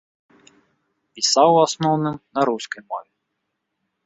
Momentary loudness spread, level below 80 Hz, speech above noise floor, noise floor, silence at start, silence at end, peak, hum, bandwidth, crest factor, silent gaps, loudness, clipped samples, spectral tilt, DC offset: 16 LU; -66 dBFS; 58 dB; -77 dBFS; 1.15 s; 1.05 s; -2 dBFS; none; 8.4 kHz; 20 dB; none; -19 LUFS; under 0.1%; -4 dB/octave; under 0.1%